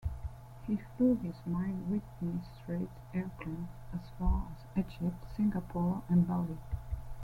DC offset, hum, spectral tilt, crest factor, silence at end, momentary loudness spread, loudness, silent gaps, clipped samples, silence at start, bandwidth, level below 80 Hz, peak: under 0.1%; none; -9.5 dB/octave; 16 dB; 0 s; 13 LU; -36 LUFS; none; under 0.1%; 0 s; 5.4 kHz; -44 dBFS; -18 dBFS